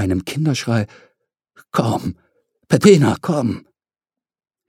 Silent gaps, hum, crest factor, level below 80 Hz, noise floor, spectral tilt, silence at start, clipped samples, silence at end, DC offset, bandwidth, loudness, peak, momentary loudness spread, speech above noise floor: none; none; 18 dB; -52 dBFS; -90 dBFS; -6.5 dB/octave; 0 s; under 0.1%; 1.1 s; under 0.1%; 16 kHz; -17 LUFS; 0 dBFS; 14 LU; 73 dB